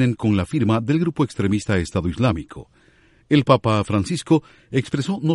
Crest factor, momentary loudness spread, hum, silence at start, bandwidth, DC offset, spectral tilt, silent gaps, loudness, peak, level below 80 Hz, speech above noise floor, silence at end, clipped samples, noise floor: 18 dB; 8 LU; none; 0 s; 11.5 kHz; under 0.1%; -7 dB/octave; none; -21 LUFS; -2 dBFS; -44 dBFS; 35 dB; 0 s; under 0.1%; -55 dBFS